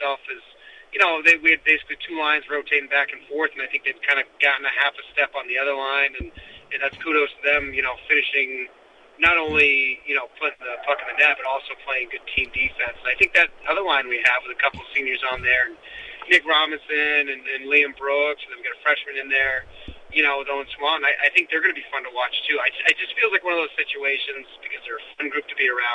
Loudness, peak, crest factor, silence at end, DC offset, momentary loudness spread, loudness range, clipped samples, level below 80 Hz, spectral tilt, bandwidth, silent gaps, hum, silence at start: -20 LUFS; -4 dBFS; 18 dB; 0 s; under 0.1%; 12 LU; 3 LU; under 0.1%; -52 dBFS; -3 dB/octave; 10.5 kHz; none; none; 0 s